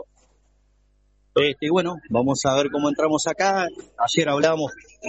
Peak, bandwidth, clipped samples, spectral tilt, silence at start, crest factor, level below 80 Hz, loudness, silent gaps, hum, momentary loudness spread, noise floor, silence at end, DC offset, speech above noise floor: -4 dBFS; 8.2 kHz; under 0.1%; -4 dB/octave; 0 s; 20 dB; -58 dBFS; -22 LUFS; none; 50 Hz at -55 dBFS; 5 LU; -61 dBFS; 0 s; under 0.1%; 40 dB